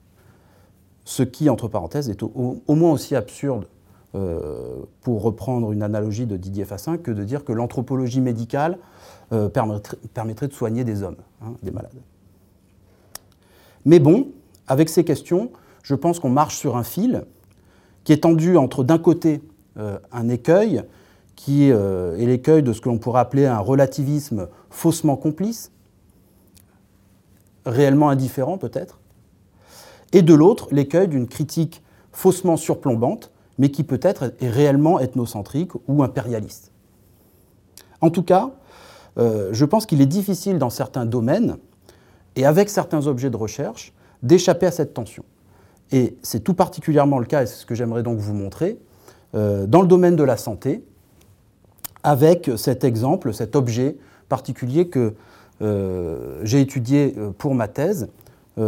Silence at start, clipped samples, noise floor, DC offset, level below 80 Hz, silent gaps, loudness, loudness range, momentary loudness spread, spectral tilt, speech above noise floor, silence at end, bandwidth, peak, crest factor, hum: 1.05 s; under 0.1%; -55 dBFS; under 0.1%; -56 dBFS; none; -20 LUFS; 6 LU; 15 LU; -7 dB/octave; 36 dB; 0 s; 17 kHz; 0 dBFS; 20 dB; none